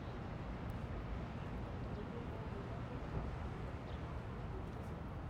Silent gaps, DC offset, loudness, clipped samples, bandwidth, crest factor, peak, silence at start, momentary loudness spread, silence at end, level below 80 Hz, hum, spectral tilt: none; under 0.1%; -46 LUFS; under 0.1%; 10.5 kHz; 16 dB; -28 dBFS; 0 s; 2 LU; 0 s; -50 dBFS; none; -8 dB/octave